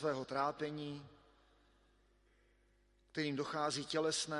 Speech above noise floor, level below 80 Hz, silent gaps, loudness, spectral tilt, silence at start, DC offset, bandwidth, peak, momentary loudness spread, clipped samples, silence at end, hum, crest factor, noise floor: 33 dB; -74 dBFS; none; -39 LUFS; -3.5 dB/octave; 0 s; under 0.1%; 11.5 kHz; -22 dBFS; 11 LU; under 0.1%; 0 s; 50 Hz at -70 dBFS; 20 dB; -72 dBFS